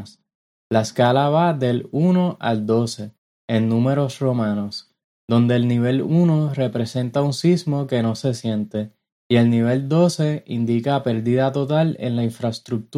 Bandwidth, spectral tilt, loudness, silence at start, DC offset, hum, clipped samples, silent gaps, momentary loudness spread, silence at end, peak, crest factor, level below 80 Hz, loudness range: 12.5 kHz; -7 dB/octave; -20 LUFS; 0 s; under 0.1%; none; under 0.1%; 0.35-0.70 s, 3.18-3.48 s, 5.04-5.28 s, 9.12-9.30 s; 8 LU; 0 s; -4 dBFS; 16 dB; -62 dBFS; 2 LU